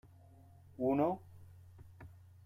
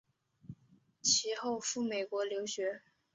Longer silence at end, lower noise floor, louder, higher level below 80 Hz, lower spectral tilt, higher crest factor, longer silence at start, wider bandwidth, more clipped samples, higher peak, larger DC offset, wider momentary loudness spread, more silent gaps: about the same, 0.4 s vs 0.35 s; second, -60 dBFS vs -68 dBFS; about the same, -36 LUFS vs -34 LUFS; first, -70 dBFS vs -78 dBFS; first, -9.5 dB/octave vs -1.5 dB/octave; about the same, 20 dB vs 20 dB; first, 0.8 s vs 0.45 s; first, 15 kHz vs 8 kHz; neither; second, -20 dBFS vs -16 dBFS; neither; first, 26 LU vs 23 LU; neither